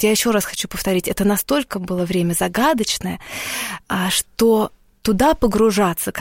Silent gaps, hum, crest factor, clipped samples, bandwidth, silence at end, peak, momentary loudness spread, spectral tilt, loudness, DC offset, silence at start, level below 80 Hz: none; none; 16 dB; under 0.1%; 17 kHz; 0 s; -4 dBFS; 8 LU; -4 dB/octave; -19 LUFS; under 0.1%; 0 s; -40 dBFS